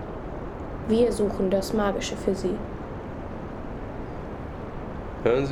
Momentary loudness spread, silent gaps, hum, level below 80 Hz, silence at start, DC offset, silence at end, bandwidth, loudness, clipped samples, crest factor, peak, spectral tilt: 13 LU; none; none; -40 dBFS; 0 s; under 0.1%; 0 s; 16.5 kHz; -28 LUFS; under 0.1%; 18 dB; -10 dBFS; -6 dB/octave